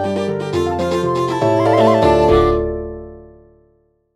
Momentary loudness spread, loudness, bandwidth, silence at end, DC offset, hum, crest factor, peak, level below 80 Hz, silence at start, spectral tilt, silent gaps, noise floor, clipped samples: 12 LU; -15 LUFS; 12.5 kHz; 0.9 s; 0.2%; none; 14 dB; -2 dBFS; -32 dBFS; 0 s; -7 dB/octave; none; -58 dBFS; under 0.1%